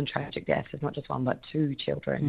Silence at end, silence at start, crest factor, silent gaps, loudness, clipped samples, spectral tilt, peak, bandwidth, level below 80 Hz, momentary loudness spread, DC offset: 0 s; 0 s; 20 dB; none; -31 LUFS; under 0.1%; -9 dB/octave; -10 dBFS; 5 kHz; -58 dBFS; 4 LU; under 0.1%